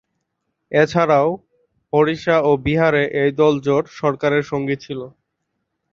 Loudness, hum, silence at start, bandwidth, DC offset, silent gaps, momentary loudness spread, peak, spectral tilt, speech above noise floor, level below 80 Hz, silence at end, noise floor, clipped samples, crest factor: -18 LUFS; none; 0.7 s; 7.2 kHz; under 0.1%; none; 9 LU; 0 dBFS; -7 dB/octave; 58 dB; -50 dBFS; 0.85 s; -75 dBFS; under 0.1%; 18 dB